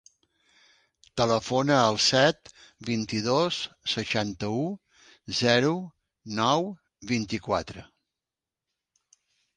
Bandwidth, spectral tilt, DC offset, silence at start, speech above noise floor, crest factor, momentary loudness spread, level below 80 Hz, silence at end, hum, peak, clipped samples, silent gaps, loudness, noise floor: 10.5 kHz; -4 dB/octave; under 0.1%; 1.15 s; 64 dB; 24 dB; 17 LU; -60 dBFS; 1.75 s; none; -4 dBFS; under 0.1%; none; -26 LUFS; -90 dBFS